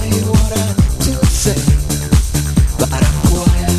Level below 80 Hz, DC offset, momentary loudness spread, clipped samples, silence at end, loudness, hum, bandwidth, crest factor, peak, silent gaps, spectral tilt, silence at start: -16 dBFS; under 0.1%; 2 LU; under 0.1%; 0 s; -14 LUFS; none; 14 kHz; 12 dB; 0 dBFS; none; -5 dB/octave; 0 s